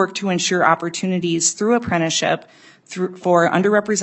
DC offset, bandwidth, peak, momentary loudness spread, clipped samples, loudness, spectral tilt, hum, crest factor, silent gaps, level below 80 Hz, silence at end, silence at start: under 0.1%; 8.6 kHz; 0 dBFS; 9 LU; under 0.1%; -18 LUFS; -3.5 dB/octave; none; 18 dB; none; -60 dBFS; 0 s; 0 s